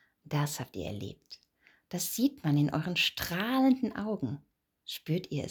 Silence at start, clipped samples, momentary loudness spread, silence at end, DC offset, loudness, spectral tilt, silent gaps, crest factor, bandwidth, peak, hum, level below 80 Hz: 0.25 s; under 0.1%; 17 LU; 0 s; under 0.1%; -31 LUFS; -5 dB/octave; none; 16 dB; over 20 kHz; -16 dBFS; none; -64 dBFS